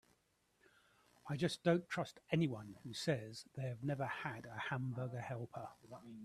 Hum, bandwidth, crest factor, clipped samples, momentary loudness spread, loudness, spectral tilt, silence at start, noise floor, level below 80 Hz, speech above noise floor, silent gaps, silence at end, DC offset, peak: none; 14 kHz; 22 dB; under 0.1%; 14 LU; -42 LUFS; -6 dB/octave; 1.25 s; -78 dBFS; -76 dBFS; 37 dB; none; 0 s; under 0.1%; -20 dBFS